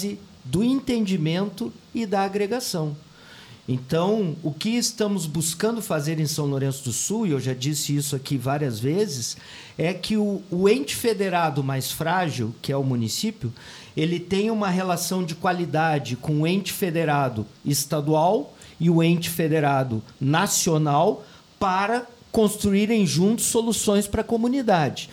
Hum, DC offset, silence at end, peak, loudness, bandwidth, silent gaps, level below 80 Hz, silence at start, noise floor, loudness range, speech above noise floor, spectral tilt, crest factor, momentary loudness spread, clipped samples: none; under 0.1%; 0 s; -6 dBFS; -23 LUFS; 19 kHz; none; -52 dBFS; 0 s; -46 dBFS; 4 LU; 23 dB; -5 dB/octave; 16 dB; 8 LU; under 0.1%